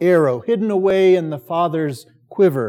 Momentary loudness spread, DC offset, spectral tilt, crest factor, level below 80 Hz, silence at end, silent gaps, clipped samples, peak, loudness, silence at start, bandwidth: 11 LU; under 0.1%; -7.5 dB/octave; 12 dB; -64 dBFS; 0 s; none; under 0.1%; -4 dBFS; -17 LUFS; 0 s; 16 kHz